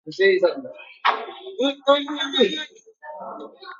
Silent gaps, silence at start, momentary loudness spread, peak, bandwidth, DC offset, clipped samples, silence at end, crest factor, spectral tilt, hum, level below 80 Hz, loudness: none; 0.05 s; 18 LU; -2 dBFS; 7.4 kHz; under 0.1%; under 0.1%; 0.05 s; 20 dB; -3.5 dB/octave; none; -78 dBFS; -21 LUFS